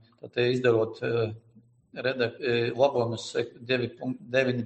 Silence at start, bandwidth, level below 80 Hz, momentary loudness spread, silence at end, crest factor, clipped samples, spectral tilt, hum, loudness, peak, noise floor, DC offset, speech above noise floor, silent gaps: 0.25 s; 8.4 kHz; -68 dBFS; 9 LU; 0 s; 18 dB; under 0.1%; -6 dB/octave; none; -28 LUFS; -10 dBFS; -59 dBFS; under 0.1%; 32 dB; none